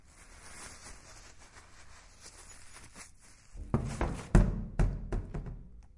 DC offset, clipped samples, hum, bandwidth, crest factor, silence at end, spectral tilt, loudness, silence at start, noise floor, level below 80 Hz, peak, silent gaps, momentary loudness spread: under 0.1%; under 0.1%; none; 11.5 kHz; 26 dB; 0.15 s; -6.5 dB/octave; -35 LUFS; 0.15 s; -56 dBFS; -38 dBFS; -8 dBFS; none; 26 LU